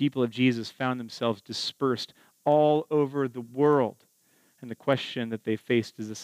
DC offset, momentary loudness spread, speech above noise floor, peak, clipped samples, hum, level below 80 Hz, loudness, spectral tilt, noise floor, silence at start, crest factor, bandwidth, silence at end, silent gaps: under 0.1%; 10 LU; 39 dB; -10 dBFS; under 0.1%; none; -80 dBFS; -27 LUFS; -6 dB/octave; -65 dBFS; 0 s; 18 dB; 15.5 kHz; 0 s; none